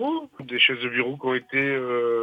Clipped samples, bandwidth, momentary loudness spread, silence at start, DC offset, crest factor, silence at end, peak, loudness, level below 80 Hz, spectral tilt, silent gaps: under 0.1%; 5.2 kHz; 10 LU; 0 s; under 0.1%; 18 dB; 0 s; -6 dBFS; -23 LUFS; -72 dBFS; -6.5 dB/octave; none